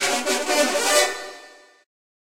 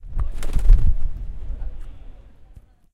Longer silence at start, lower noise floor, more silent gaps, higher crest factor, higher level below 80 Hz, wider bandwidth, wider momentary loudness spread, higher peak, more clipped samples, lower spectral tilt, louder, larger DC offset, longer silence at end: about the same, 0 s vs 0.05 s; about the same, -47 dBFS vs -47 dBFS; neither; about the same, 20 dB vs 16 dB; second, -64 dBFS vs -20 dBFS; first, 16 kHz vs 3.8 kHz; second, 13 LU vs 22 LU; about the same, -4 dBFS vs -2 dBFS; neither; second, 0.5 dB/octave vs -7 dB/octave; first, -20 LUFS vs -26 LUFS; neither; second, 0.65 s vs 0.8 s